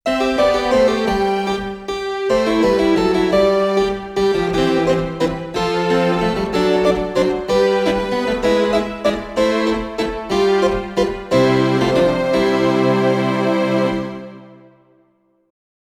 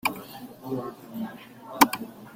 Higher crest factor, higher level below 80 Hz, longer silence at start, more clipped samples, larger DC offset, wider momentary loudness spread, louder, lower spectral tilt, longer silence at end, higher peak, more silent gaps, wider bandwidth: second, 14 dB vs 28 dB; first, -38 dBFS vs -66 dBFS; about the same, 0.05 s vs 0.05 s; neither; neither; second, 6 LU vs 20 LU; first, -17 LUFS vs -27 LUFS; first, -6 dB/octave vs -3 dB/octave; first, 1.5 s vs 0 s; about the same, -2 dBFS vs -2 dBFS; neither; second, 14.5 kHz vs 16.5 kHz